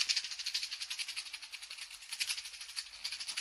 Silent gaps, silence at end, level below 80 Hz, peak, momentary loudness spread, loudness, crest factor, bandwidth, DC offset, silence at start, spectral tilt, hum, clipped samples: none; 0 s; -78 dBFS; -12 dBFS; 10 LU; -38 LUFS; 30 dB; 16.5 kHz; under 0.1%; 0 s; 4.5 dB/octave; none; under 0.1%